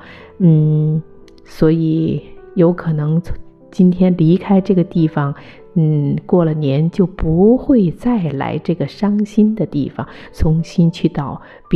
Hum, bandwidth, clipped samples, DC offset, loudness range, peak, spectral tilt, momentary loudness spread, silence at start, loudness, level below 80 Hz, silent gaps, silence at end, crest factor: none; 6.6 kHz; under 0.1%; under 0.1%; 2 LU; -2 dBFS; -9.5 dB/octave; 12 LU; 0.05 s; -15 LUFS; -34 dBFS; none; 0 s; 14 dB